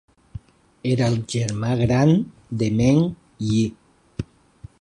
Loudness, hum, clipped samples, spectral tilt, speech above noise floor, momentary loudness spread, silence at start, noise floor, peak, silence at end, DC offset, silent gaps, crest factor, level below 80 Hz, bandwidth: -21 LUFS; none; under 0.1%; -7 dB/octave; 26 dB; 21 LU; 0.35 s; -46 dBFS; -4 dBFS; 0.6 s; under 0.1%; none; 18 dB; -46 dBFS; 11 kHz